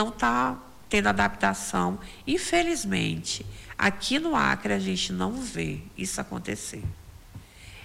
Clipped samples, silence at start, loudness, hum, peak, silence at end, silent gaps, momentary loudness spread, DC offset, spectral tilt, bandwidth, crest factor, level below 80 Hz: under 0.1%; 0 s; -27 LUFS; none; -10 dBFS; 0 s; none; 14 LU; under 0.1%; -4 dB/octave; 16 kHz; 18 dB; -48 dBFS